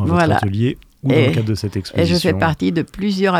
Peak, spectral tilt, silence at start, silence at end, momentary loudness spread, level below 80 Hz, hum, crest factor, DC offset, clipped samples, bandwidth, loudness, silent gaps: 0 dBFS; -6.5 dB/octave; 0 s; 0 s; 7 LU; -44 dBFS; none; 16 dB; under 0.1%; under 0.1%; 15 kHz; -17 LUFS; none